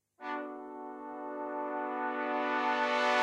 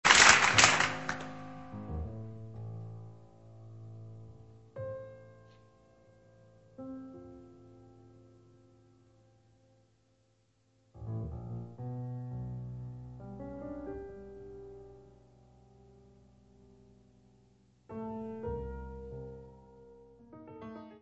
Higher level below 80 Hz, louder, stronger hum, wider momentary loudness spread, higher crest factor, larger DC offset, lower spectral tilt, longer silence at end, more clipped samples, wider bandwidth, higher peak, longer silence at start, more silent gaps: second, -82 dBFS vs -56 dBFS; second, -34 LUFS vs -30 LUFS; neither; second, 14 LU vs 27 LU; second, 20 dB vs 32 dB; neither; about the same, -2 dB/octave vs -1 dB/octave; about the same, 0 s vs 0.05 s; neither; first, 11 kHz vs 8 kHz; second, -14 dBFS vs -4 dBFS; first, 0.2 s vs 0.05 s; neither